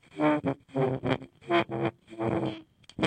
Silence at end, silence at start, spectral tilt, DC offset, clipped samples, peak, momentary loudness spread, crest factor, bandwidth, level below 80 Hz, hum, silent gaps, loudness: 0 s; 0.15 s; -7 dB/octave; under 0.1%; under 0.1%; -8 dBFS; 8 LU; 22 dB; 9 kHz; -60 dBFS; none; none; -30 LUFS